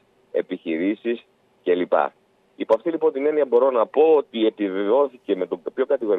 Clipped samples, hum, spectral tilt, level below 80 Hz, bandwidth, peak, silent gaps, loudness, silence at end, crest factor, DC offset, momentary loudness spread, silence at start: under 0.1%; none; -7.5 dB/octave; -74 dBFS; 4 kHz; -6 dBFS; none; -22 LUFS; 0 s; 16 dB; under 0.1%; 10 LU; 0.35 s